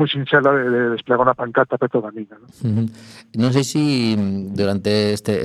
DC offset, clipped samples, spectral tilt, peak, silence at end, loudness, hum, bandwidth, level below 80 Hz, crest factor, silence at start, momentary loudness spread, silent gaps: under 0.1%; under 0.1%; -6 dB/octave; 0 dBFS; 0 s; -19 LUFS; none; 13.5 kHz; -58 dBFS; 18 dB; 0 s; 11 LU; none